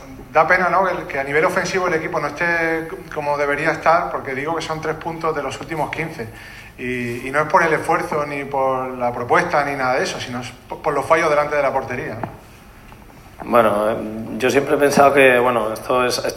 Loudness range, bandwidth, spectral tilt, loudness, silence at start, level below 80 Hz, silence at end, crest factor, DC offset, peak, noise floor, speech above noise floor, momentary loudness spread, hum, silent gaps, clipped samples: 5 LU; 16 kHz; -4.5 dB/octave; -19 LUFS; 0 s; -48 dBFS; 0 s; 18 dB; under 0.1%; 0 dBFS; -42 dBFS; 23 dB; 12 LU; none; none; under 0.1%